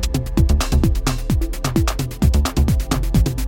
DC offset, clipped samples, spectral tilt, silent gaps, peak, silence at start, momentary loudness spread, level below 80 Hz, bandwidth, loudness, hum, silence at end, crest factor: under 0.1%; under 0.1%; -5.5 dB/octave; none; -4 dBFS; 0 s; 4 LU; -20 dBFS; 17 kHz; -19 LUFS; none; 0 s; 14 dB